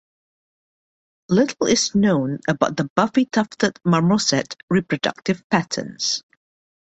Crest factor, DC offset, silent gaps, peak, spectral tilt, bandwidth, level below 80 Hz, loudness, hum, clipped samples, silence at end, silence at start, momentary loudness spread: 20 dB; under 0.1%; 2.90-2.96 s, 4.63-4.68 s, 5.44-5.50 s; -2 dBFS; -4.5 dB/octave; 8.2 kHz; -58 dBFS; -20 LUFS; none; under 0.1%; 0.65 s; 1.3 s; 6 LU